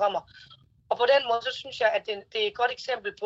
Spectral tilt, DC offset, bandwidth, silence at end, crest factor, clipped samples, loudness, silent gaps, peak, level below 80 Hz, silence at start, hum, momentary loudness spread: -2.5 dB/octave; under 0.1%; 7.8 kHz; 0 s; 18 dB; under 0.1%; -27 LUFS; none; -10 dBFS; -68 dBFS; 0 s; none; 10 LU